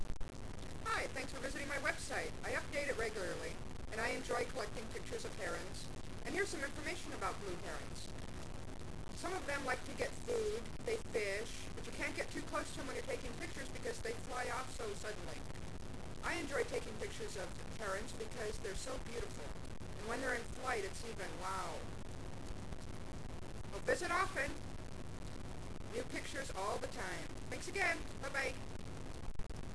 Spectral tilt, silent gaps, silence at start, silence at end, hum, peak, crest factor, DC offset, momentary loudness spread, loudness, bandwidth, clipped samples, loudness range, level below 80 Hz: -4 dB/octave; none; 0 s; 0 s; none; -24 dBFS; 20 dB; 0.4%; 11 LU; -43 LUFS; 11 kHz; under 0.1%; 3 LU; -52 dBFS